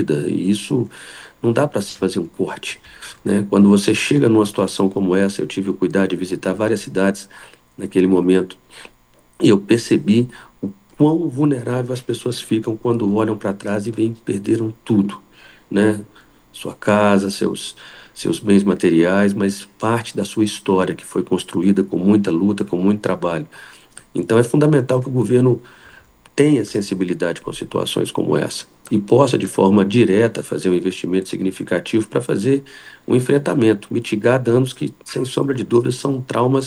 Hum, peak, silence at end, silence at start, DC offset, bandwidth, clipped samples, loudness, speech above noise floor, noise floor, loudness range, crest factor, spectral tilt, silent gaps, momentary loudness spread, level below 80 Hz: none; 0 dBFS; 0 s; 0 s; under 0.1%; 12.5 kHz; under 0.1%; -18 LUFS; 30 dB; -47 dBFS; 4 LU; 18 dB; -6.5 dB/octave; none; 12 LU; -56 dBFS